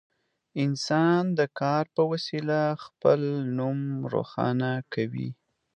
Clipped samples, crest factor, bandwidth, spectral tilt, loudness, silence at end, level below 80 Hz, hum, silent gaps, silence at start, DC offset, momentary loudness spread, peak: under 0.1%; 20 dB; 9.4 kHz; -7 dB/octave; -27 LUFS; 0.45 s; -70 dBFS; none; none; 0.55 s; under 0.1%; 7 LU; -8 dBFS